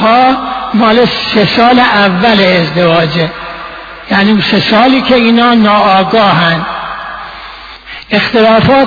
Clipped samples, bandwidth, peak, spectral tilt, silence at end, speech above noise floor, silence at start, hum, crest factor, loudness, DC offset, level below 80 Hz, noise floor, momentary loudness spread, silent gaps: 0.3%; 5.4 kHz; 0 dBFS; -7 dB/octave; 0 s; 21 dB; 0 s; none; 8 dB; -8 LUFS; under 0.1%; -38 dBFS; -28 dBFS; 17 LU; none